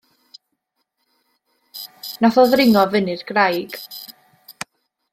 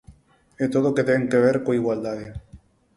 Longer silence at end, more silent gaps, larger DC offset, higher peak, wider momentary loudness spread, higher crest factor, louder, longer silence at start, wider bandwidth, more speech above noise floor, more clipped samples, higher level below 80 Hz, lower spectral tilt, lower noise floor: first, 1 s vs 0.4 s; neither; neither; first, -2 dBFS vs -6 dBFS; first, 21 LU vs 15 LU; about the same, 20 dB vs 18 dB; first, -16 LUFS vs -22 LUFS; first, 1.75 s vs 0.1 s; first, 16.5 kHz vs 11.5 kHz; first, 58 dB vs 33 dB; neither; second, -62 dBFS vs -52 dBFS; second, -5 dB/octave vs -7.5 dB/octave; first, -74 dBFS vs -54 dBFS